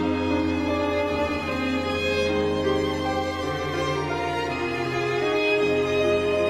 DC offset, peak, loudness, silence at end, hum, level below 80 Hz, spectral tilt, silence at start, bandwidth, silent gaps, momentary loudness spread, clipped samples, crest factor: under 0.1%; -12 dBFS; -24 LUFS; 0 s; none; -46 dBFS; -5.5 dB/octave; 0 s; 15 kHz; none; 5 LU; under 0.1%; 12 dB